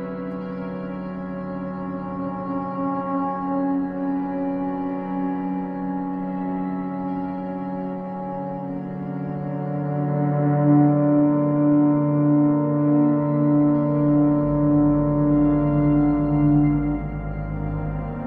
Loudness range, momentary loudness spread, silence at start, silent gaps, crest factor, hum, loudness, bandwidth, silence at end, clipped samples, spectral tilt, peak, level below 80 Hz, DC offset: 9 LU; 12 LU; 0 s; none; 16 dB; none; -22 LUFS; 3 kHz; 0 s; under 0.1%; -13 dB/octave; -6 dBFS; -40 dBFS; under 0.1%